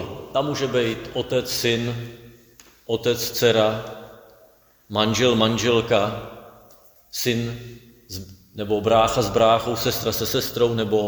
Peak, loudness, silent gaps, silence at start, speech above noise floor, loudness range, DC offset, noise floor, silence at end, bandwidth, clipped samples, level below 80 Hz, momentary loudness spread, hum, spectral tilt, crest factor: -2 dBFS; -21 LUFS; none; 0 s; 34 dB; 4 LU; under 0.1%; -55 dBFS; 0 s; over 20 kHz; under 0.1%; -50 dBFS; 18 LU; none; -4.5 dB/octave; 20 dB